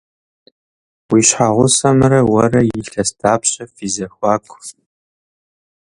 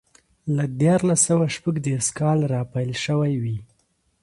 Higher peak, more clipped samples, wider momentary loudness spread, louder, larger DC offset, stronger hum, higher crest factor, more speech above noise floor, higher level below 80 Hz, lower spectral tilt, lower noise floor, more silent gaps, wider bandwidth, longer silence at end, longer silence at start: first, 0 dBFS vs -8 dBFS; neither; first, 12 LU vs 9 LU; first, -14 LUFS vs -22 LUFS; neither; neither; about the same, 16 dB vs 16 dB; first, over 76 dB vs 45 dB; first, -46 dBFS vs -56 dBFS; about the same, -4.5 dB/octave vs -5.5 dB/octave; first, under -90 dBFS vs -67 dBFS; neither; about the same, 11.5 kHz vs 11.5 kHz; first, 1.15 s vs 0.6 s; first, 1.1 s vs 0.45 s